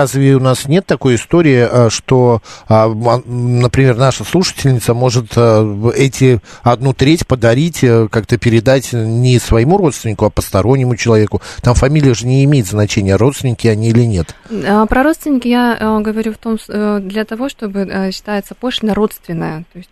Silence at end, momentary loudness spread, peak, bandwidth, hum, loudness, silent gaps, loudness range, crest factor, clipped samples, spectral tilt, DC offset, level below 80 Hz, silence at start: 0.1 s; 8 LU; 0 dBFS; 14 kHz; none; -12 LUFS; none; 4 LU; 12 dB; under 0.1%; -6.5 dB/octave; under 0.1%; -32 dBFS; 0 s